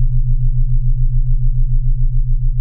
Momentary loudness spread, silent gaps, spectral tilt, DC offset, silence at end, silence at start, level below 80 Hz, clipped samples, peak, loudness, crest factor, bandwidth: 1 LU; none; -28 dB/octave; under 0.1%; 0 s; 0 s; -12 dBFS; under 0.1%; -4 dBFS; -20 LUFS; 8 dB; 0.2 kHz